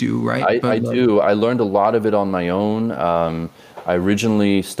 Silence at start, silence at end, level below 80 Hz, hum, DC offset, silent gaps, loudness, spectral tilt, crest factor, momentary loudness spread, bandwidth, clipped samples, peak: 0 s; 0 s; -52 dBFS; none; under 0.1%; none; -18 LUFS; -6.5 dB/octave; 14 dB; 6 LU; 15.5 kHz; under 0.1%; -4 dBFS